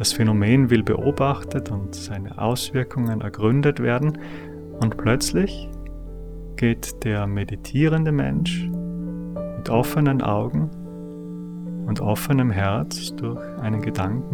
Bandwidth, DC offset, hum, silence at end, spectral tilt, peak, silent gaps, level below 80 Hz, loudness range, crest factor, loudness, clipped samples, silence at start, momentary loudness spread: 20 kHz; under 0.1%; none; 0 s; -6 dB/octave; -4 dBFS; none; -40 dBFS; 3 LU; 18 dB; -23 LUFS; under 0.1%; 0 s; 15 LU